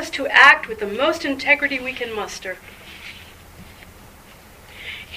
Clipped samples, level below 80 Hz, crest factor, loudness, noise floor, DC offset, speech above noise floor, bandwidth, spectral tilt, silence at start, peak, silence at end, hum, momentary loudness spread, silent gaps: under 0.1%; -50 dBFS; 22 dB; -16 LUFS; -45 dBFS; under 0.1%; 26 dB; 15.5 kHz; -2.5 dB/octave; 0 s; 0 dBFS; 0 s; none; 26 LU; none